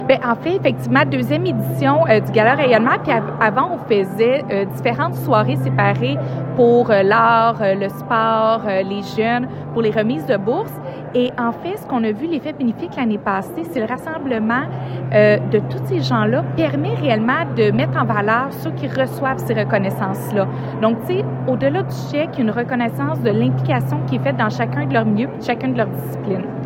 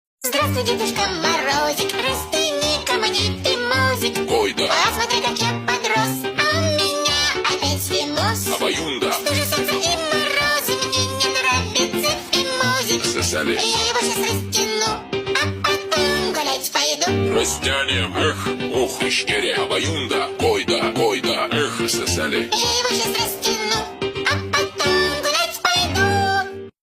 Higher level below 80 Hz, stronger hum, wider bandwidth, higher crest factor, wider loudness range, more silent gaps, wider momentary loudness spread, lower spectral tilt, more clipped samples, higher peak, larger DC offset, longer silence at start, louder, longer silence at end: about the same, -52 dBFS vs -48 dBFS; neither; about the same, 16 kHz vs 16.5 kHz; about the same, 16 dB vs 16 dB; first, 5 LU vs 1 LU; neither; first, 9 LU vs 4 LU; first, -7.5 dB/octave vs -2.5 dB/octave; neither; first, 0 dBFS vs -4 dBFS; neither; second, 0 s vs 0.2 s; about the same, -18 LUFS vs -19 LUFS; about the same, 0 s vs 0.1 s